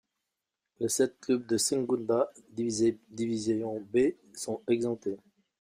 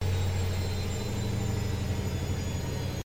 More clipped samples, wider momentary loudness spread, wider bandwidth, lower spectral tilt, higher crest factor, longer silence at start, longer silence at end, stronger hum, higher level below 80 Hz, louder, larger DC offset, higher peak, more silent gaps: neither; first, 8 LU vs 3 LU; about the same, 15.5 kHz vs 16.5 kHz; about the same, -4.5 dB/octave vs -5.5 dB/octave; about the same, 16 dB vs 12 dB; first, 0.8 s vs 0 s; first, 0.45 s vs 0 s; neither; second, -70 dBFS vs -42 dBFS; about the same, -30 LUFS vs -32 LUFS; neither; first, -14 dBFS vs -18 dBFS; neither